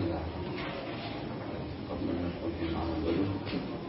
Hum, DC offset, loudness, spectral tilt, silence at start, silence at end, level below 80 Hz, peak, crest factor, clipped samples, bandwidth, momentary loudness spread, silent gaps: none; under 0.1%; -35 LUFS; -6 dB/octave; 0 s; 0 s; -48 dBFS; -20 dBFS; 14 dB; under 0.1%; 5.8 kHz; 7 LU; none